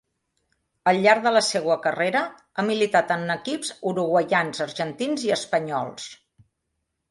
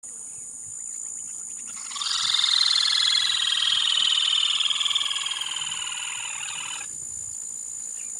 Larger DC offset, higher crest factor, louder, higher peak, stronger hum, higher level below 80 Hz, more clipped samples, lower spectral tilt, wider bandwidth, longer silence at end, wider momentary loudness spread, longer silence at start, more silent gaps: neither; about the same, 20 dB vs 18 dB; about the same, -23 LUFS vs -23 LUFS; first, -4 dBFS vs -8 dBFS; neither; about the same, -70 dBFS vs -70 dBFS; neither; first, -4 dB/octave vs 3.5 dB/octave; second, 11.5 kHz vs 16 kHz; first, 0.95 s vs 0 s; second, 10 LU vs 14 LU; first, 0.85 s vs 0.05 s; neither